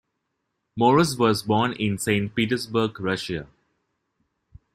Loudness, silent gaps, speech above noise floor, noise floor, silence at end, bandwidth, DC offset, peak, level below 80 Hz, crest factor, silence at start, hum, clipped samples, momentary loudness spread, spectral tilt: -23 LUFS; none; 55 dB; -78 dBFS; 1.3 s; 15.5 kHz; under 0.1%; -6 dBFS; -56 dBFS; 20 dB; 0.75 s; none; under 0.1%; 10 LU; -5.5 dB/octave